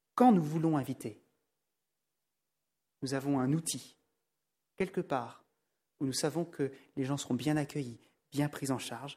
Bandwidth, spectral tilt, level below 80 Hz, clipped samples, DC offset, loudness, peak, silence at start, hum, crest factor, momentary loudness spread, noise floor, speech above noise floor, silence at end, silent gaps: 16 kHz; -5.5 dB/octave; -74 dBFS; under 0.1%; under 0.1%; -34 LUFS; -12 dBFS; 0.15 s; none; 22 dB; 12 LU; -88 dBFS; 55 dB; 0 s; none